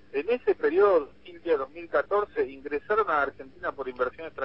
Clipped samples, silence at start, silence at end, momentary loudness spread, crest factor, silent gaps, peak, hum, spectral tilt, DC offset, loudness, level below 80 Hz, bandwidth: under 0.1%; 0.15 s; 0 s; 12 LU; 16 dB; none; -10 dBFS; none; -7.5 dB/octave; 0.2%; -27 LUFS; -60 dBFS; 5.8 kHz